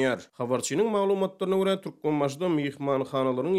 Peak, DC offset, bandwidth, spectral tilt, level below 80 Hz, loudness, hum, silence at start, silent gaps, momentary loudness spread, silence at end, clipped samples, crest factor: -12 dBFS; under 0.1%; 15 kHz; -5.5 dB/octave; -74 dBFS; -27 LUFS; none; 0 s; none; 4 LU; 0 s; under 0.1%; 14 dB